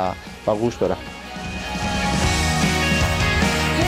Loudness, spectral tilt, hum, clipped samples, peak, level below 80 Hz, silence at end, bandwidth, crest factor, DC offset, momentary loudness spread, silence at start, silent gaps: -21 LUFS; -4.5 dB/octave; none; under 0.1%; -6 dBFS; -32 dBFS; 0 s; 16.5 kHz; 14 dB; under 0.1%; 10 LU; 0 s; none